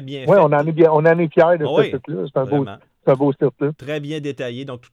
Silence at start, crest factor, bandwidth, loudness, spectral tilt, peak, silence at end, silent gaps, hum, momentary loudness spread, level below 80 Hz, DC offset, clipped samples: 0 s; 16 dB; 7.8 kHz; -17 LUFS; -8.5 dB/octave; -2 dBFS; 0.15 s; none; none; 13 LU; -62 dBFS; under 0.1%; under 0.1%